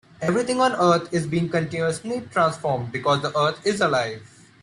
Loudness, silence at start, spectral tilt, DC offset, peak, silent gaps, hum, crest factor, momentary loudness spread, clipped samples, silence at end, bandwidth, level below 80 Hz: -22 LUFS; 0.2 s; -5 dB/octave; under 0.1%; -6 dBFS; none; none; 16 dB; 7 LU; under 0.1%; 0.35 s; 11 kHz; -60 dBFS